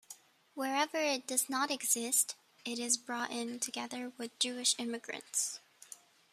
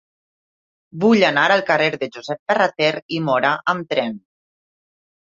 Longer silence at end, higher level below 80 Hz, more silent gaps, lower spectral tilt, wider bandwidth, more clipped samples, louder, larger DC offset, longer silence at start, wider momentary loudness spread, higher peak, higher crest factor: second, 0.4 s vs 1.1 s; second, -90 dBFS vs -66 dBFS; second, none vs 2.39-2.46 s, 3.02-3.09 s; second, 0 dB/octave vs -5.5 dB/octave; first, 15 kHz vs 7.6 kHz; neither; second, -34 LUFS vs -18 LUFS; neither; second, 0.1 s vs 0.95 s; first, 21 LU vs 13 LU; second, -14 dBFS vs -2 dBFS; about the same, 22 dB vs 18 dB